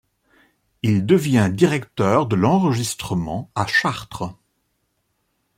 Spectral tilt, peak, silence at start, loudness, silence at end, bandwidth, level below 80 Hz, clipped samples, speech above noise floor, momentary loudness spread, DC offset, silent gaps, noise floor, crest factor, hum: -6 dB/octave; -2 dBFS; 0.85 s; -20 LUFS; 1.25 s; 16 kHz; -52 dBFS; under 0.1%; 51 dB; 10 LU; under 0.1%; none; -70 dBFS; 18 dB; none